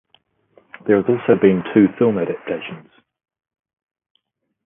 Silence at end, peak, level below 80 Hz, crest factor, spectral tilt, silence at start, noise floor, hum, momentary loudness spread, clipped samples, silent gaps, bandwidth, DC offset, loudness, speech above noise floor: 1.9 s; 0 dBFS; -58 dBFS; 20 dB; -12 dB/octave; 0.85 s; -60 dBFS; none; 15 LU; under 0.1%; none; 3.7 kHz; under 0.1%; -17 LUFS; 44 dB